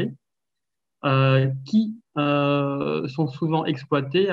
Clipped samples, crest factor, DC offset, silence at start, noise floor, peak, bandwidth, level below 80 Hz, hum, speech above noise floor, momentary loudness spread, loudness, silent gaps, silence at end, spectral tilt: under 0.1%; 16 dB; under 0.1%; 0 s; -87 dBFS; -6 dBFS; 7 kHz; -68 dBFS; none; 65 dB; 7 LU; -23 LUFS; none; 0 s; -8.5 dB/octave